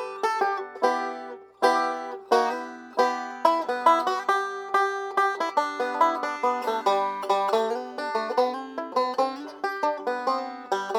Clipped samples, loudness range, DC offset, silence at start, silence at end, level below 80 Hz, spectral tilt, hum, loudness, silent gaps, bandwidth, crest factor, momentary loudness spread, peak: under 0.1%; 3 LU; under 0.1%; 0 s; 0 s; -80 dBFS; -2.5 dB/octave; none; -26 LUFS; none; over 20 kHz; 22 dB; 7 LU; -4 dBFS